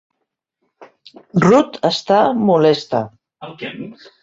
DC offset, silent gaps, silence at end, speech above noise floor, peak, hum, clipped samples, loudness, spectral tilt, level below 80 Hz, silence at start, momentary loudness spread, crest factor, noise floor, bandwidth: under 0.1%; none; 0.3 s; 60 dB; -2 dBFS; none; under 0.1%; -15 LUFS; -6.5 dB/octave; -58 dBFS; 0.8 s; 20 LU; 16 dB; -76 dBFS; 7.8 kHz